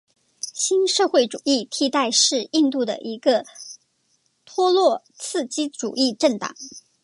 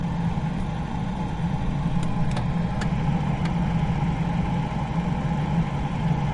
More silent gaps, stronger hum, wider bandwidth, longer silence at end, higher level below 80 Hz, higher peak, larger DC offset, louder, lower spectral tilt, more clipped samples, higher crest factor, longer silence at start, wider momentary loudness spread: neither; neither; about the same, 11.5 kHz vs 10.5 kHz; first, 0.25 s vs 0 s; second, -78 dBFS vs -34 dBFS; first, -4 dBFS vs -12 dBFS; neither; first, -21 LUFS vs -26 LUFS; second, -2 dB/octave vs -8 dB/octave; neither; first, 18 dB vs 12 dB; first, 0.45 s vs 0 s; first, 14 LU vs 4 LU